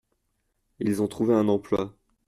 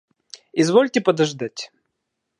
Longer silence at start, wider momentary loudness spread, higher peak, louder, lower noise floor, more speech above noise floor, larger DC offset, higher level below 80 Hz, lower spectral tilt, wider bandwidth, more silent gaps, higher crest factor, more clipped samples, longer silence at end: first, 0.8 s vs 0.55 s; second, 8 LU vs 16 LU; second, -10 dBFS vs -2 dBFS; second, -25 LUFS vs -20 LUFS; about the same, -75 dBFS vs -78 dBFS; second, 51 dB vs 59 dB; neither; first, -60 dBFS vs -74 dBFS; first, -7.5 dB/octave vs -5 dB/octave; first, 14 kHz vs 11 kHz; neither; about the same, 16 dB vs 20 dB; neither; second, 0.4 s vs 0.75 s